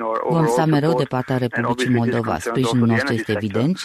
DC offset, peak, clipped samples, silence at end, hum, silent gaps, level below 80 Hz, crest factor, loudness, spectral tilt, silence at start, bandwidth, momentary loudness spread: under 0.1%; -6 dBFS; under 0.1%; 0 s; none; none; -52 dBFS; 14 dB; -19 LUFS; -6.5 dB/octave; 0 s; 14 kHz; 5 LU